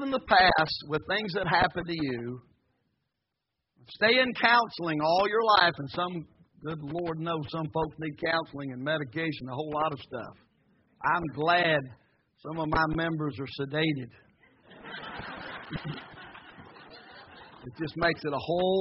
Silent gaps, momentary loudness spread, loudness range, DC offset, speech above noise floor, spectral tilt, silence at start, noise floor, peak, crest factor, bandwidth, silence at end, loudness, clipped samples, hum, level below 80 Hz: none; 23 LU; 11 LU; under 0.1%; 56 dB; -2.5 dB/octave; 0 s; -84 dBFS; -8 dBFS; 22 dB; 5.8 kHz; 0 s; -28 LUFS; under 0.1%; none; -56 dBFS